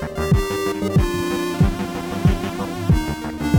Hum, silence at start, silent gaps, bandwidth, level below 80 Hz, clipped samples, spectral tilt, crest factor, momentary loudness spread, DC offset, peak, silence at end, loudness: none; 0 s; none; 19.5 kHz; -28 dBFS; under 0.1%; -6.5 dB/octave; 14 dB; 6 LU; under 0.1%; -4 dBFS; 0 s; -21 LUFS